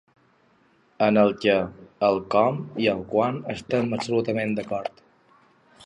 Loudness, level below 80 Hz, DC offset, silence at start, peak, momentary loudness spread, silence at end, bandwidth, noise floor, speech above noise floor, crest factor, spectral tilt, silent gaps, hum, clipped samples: -24 LUFS; -60 dBFS; under 0.1%; 1 s; -6 dBFS; 11 LU; 0.95 s; 10.5 kHz; -61 dBFS; 38 dB; 20 dB; -6.5 dB/octave; none; none; under 0.1%